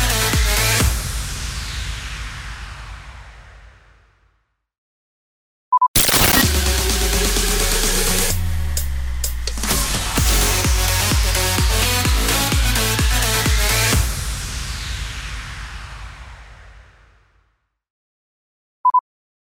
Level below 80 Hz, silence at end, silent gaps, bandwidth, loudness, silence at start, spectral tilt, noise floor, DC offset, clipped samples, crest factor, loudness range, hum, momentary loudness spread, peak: -24 dBFS; 0.55 s; 4.78-5.72 s, 5.88-5.94 s, 17.90-18.84 s; over 20 kHz; -18 LUFS; 0 s; -2.5 dB/octave; -66 dBFS; under 0.1%; under 0.1%; 18 dB; 16 LU; none; 16 LU; -2 dBFS